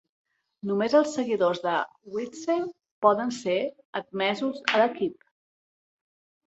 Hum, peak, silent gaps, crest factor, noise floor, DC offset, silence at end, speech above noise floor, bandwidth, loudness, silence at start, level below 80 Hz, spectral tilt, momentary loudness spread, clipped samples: none; -4 dBFS; 2.91-3.02 s, 3.85-3.93 s; 24 dB; under -90 dBFS; under 0.1%; 1.35 s; over 64 dB; 8.2 kHz; -26 LUFS; 0.65 s; -74 dBFS; -4.5 dB/octave; 11 LU; under 0.1%